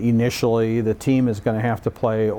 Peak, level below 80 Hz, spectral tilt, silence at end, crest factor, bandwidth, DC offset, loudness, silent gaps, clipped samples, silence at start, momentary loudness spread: -8 dBFS; -48 dBFS; -7 dB/octave; 0 s; 12 dB; 18 kHz; under 0.1%; -21 LUFS; none; under 0.1%; 0 s; 3 LU